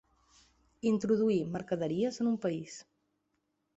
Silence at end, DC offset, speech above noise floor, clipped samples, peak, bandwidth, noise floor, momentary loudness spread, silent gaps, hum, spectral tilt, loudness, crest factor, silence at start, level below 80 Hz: 0.95 s; under 0.1%; 49 dB; under 0.1%; -18 dBFS; 8 kHz; -80 dBFS; 11 LU; none; none; -6.5 dB/octave; -32 LUFS; 16 dB; 0.85 s; -70 dBFS